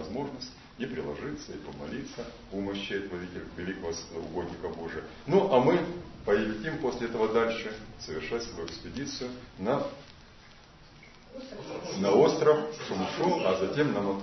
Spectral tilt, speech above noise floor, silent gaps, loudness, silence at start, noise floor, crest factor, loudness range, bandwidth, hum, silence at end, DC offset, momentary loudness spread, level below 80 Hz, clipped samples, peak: -5.5 dB/octave; 23 dB; none; -30 LUFS; 0 s; -53 dBFS; 22 dB; 9 LU; 6.2 kHz; none; 0 s; under 0.1%; 16 LU; -56 dBFS; under 0.1%; -10 dBFS